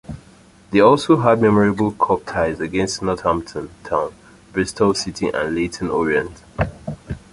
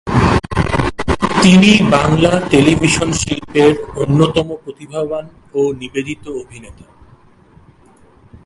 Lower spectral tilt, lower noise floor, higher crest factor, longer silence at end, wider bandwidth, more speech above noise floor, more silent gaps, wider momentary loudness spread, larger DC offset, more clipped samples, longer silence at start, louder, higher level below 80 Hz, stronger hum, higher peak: about the same, -5.5 dB/octave vs -5.5 dB/octave; about the same, -48 dBFS vs -47 dBFS; about the same, 18 dB vs 14 dB; second, 0.15 s vs 1.75 s; about the same, 11.5 kHz vs 11.5 kHz; about the same, 30 dB vs 33 dB; neither; about the same, 17 LU vs 16 LU; neither; neither; about the same, 0.1 s vs 0.05 s; second, -19 LUFS vs -13 LUFS; second, -42 dBFS vs -32 dBFS; neither; about the same, -2 dBFS vs 0 dBFS